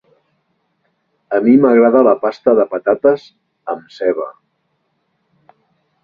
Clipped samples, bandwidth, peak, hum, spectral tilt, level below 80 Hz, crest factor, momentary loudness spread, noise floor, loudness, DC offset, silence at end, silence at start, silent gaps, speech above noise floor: under 0.1%; 5.2 kHz; 0 dBFS; none; -8.5 dB/octave; -62 dBFS; 16 dB; 16 LU; -67 dBFS; -14 LUFS; under 0.1%; 1.7 s; 1.3 s; none; 54 dB